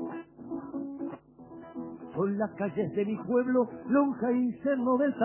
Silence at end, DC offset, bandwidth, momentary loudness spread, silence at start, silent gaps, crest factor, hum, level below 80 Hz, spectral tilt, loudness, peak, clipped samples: 0 s; under 0.1%; 3.2 kHz; 15 LU; 0 s; none; 16 dB; none; -70 dBFS; -7.5 dB/octave; -30 LUFS; -14 dBFS; under 0.1%